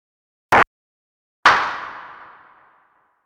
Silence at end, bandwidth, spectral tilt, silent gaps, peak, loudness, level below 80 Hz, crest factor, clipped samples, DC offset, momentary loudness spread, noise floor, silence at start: 1.15 s; 17.5 kHz; -3 dB/octave; 0.67-1.43 s; 0 dBFS; -17 LUFS; -54 dBFS; 22 dB; under 0.1%; under 0.1%; 21 LU; -60 dBFS; 0.5 s